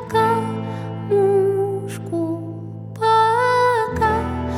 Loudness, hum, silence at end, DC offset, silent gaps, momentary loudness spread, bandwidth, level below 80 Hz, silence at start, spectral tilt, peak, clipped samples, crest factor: -19 LUFS; none; 0 s; under 0.1%; none; 12 LU; 14 kHz; -42 dBFS; 0 s; -6.5 dB/octave; -6 dBFS; under 0.1%; 14 dB